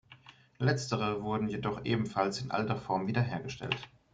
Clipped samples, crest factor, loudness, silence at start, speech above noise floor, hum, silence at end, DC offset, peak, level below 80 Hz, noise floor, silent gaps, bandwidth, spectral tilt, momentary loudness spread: under 0.1%; 20 dB; -33 LUFS; 0.1 s; 25 dB; none; 0.25 s; under 0.1%; -12 dBFS; -62 dBFS; -57 dBFS; none; 9.2 kHz; -6 dB/octave; 5 LU